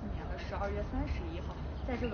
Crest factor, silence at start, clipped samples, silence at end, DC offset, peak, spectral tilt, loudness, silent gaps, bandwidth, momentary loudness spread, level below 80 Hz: 16 dB; 0 s; under 0.1%; 0 s; under 0.1%; -22 dBFS; -6.5 dB/octave; -39 LUFS; none; 6.6 kHz; 4 LU; -40 dBFS